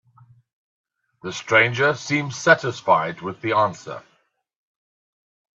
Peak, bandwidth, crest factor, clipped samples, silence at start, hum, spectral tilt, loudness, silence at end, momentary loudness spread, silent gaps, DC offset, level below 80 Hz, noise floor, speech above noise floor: 0 dBFS; 8.2 kHz; 22 dB; under 0.1%; 1.25 s; none; -4.5 dB/octave; -20 LUFS; 1.6 s; 19 LU; none; under 0.1%; -66 dBFS; -54 dBFS; 33 dB